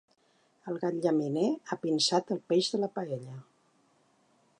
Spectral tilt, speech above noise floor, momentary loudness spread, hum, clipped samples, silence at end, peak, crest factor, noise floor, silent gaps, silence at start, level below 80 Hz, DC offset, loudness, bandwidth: -4.5 dB/octave; 39 dB; 13 LU; none; under 0.1%; 1.2 s; -14 dBFS; 18 dB; -69 dBFS; none; 0.65 s; -84 dBFS; under 0.1%; -30 LUFS; 11 kHz